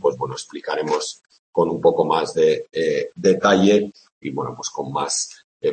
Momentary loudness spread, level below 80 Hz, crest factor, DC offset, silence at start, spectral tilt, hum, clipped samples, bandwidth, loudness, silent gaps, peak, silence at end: 14 LU; -62 dBFS; 18 dB; under 0.1%; 0 s; -4.5 dB/octave; none; under 0.1%; 8.8 kHz; -21 LUFS; 1.39-1.53 s, 4.12-4.21 s, 5.44-5.60 s; -2 dBFS; 0 s